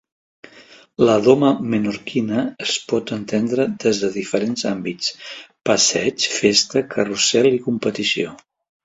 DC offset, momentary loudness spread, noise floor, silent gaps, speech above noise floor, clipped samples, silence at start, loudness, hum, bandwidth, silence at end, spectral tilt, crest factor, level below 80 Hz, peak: under 0.1%; 9 LU; -47 dBFS; none; 28 dB; under 0.1%; 0.55 s; -19 LUFS; none; 8.2 kHz; 0.5 s; -3.5 dB/octave; 20 dB; -58 dBFS; 0 dBFS